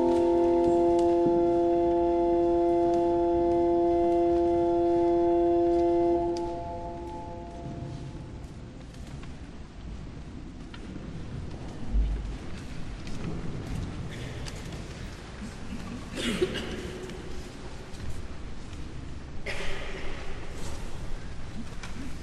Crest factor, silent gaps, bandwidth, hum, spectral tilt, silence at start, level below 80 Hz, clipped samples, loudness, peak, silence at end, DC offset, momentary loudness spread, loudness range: 14 dB; none; 11 kHz; none; -7 dB/octave; 0 s; -40 dBFS; under 0.1%; -27 LUFS; -14 dBFS; 0 s; under 0.1%; 19 LU; 17 LU